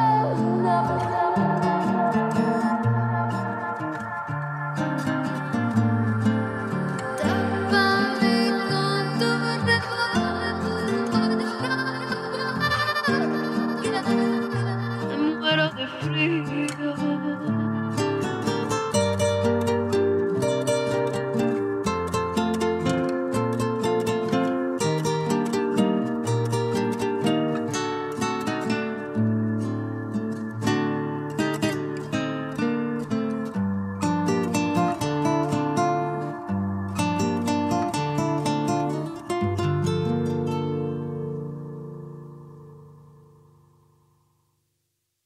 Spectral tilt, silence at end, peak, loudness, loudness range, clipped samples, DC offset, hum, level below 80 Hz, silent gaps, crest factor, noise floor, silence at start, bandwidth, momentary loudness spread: -6 dB/octave; 2.25 s; -8 dBFS; -25 LUFS; 4 LU; under 0.1%; under 0.1%; none; -58 dBFS; none; 16 dB; -76 dBFS; 0 s; 15 kHz; 7 LU